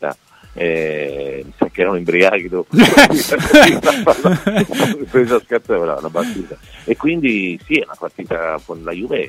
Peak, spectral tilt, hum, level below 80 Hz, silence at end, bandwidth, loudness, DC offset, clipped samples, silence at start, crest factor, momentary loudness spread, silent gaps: 0 dBFS; -4.5 dB/octave; none; -42 dBFS; 0 s; 16.5 kHz; -14 LUFS; under 0.1%; 0.1%; 0 s; 16 dB; 17 LU; none